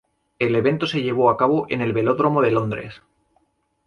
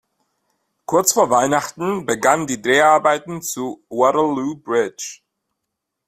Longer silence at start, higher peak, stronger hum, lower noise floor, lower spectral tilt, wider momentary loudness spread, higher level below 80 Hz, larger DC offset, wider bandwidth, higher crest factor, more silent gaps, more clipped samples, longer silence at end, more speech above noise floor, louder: second, 0.4 s vs 0.9 s; about the same, -4 dBFS vs -2 dBFS; neither; second, -66 dBFS vs -79 dBFS; first, -7.5 dB/octave vs -3.5 dB/octave; second, 8 LU vs 12 LU; about the same, -58 dBFS vs -60 dBFS; neither; second, 10.5 kHz vs 16 kHz; about the same, 18 dB vs 18 dB; neither; neither; about the same, 0.9 s vs 0.95 s; second, 46 dB vs 61 dB; about the same, -20 LUFS vs -18 LUFS